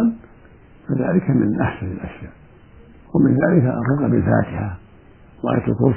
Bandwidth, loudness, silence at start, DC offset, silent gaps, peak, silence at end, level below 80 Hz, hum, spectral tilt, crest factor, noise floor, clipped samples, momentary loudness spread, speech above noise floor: 3.3 kHz; -19 LUFS; 0 s; under 0.1%; none; -2 dBFS; 0 s; -44 dBFS; none; -14 dB/octave; 18 dB; -46 dBFS; under 0.1%; 20 LU; 28 dB